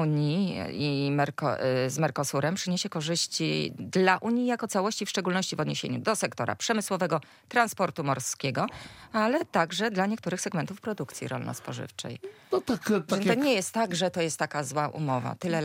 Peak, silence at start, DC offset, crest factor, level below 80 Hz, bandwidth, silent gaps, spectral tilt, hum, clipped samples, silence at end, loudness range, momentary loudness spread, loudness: -8 dBFS; 0 s; under 0.1%; 20 dB; -70 dBFS; 16.5 kHz; none; -4.5 dB/octave; none; under 0.1%; 0 s; 3 LU; 9 LU; -28 LUFS